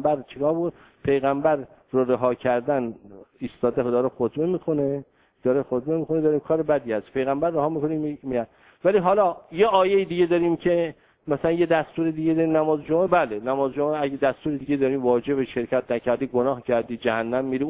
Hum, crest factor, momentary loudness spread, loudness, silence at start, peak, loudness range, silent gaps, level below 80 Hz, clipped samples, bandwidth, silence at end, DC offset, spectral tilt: none; 18 dB; 7 LU; -23 LUFS; 0 s; -6 dBFS; 3 LU; none; -58 dBFS; under 0.1%; 4 kHz; 0 s; under 0.1%; -11 dB/octave